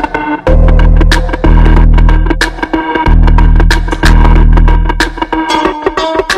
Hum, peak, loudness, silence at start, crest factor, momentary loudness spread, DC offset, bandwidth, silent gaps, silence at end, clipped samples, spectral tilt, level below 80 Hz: none; 0 dBFS; -10 LUFS; 0 s; 6 dB; 5 LU; 0.5%; 10 kHz; none; 0 s; 3%; -6 dB/octave; -8 dBFS